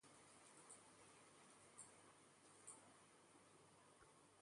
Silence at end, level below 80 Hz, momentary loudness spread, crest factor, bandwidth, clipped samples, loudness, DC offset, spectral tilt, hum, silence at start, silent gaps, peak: 0 s; under -90 dBFS; 8 LU; 24 dB; 11.5 kHz; under 0.1%; -66 LUFS; under 0.1%; -2 dB/octave; none; 0 s; none; -44 dBFS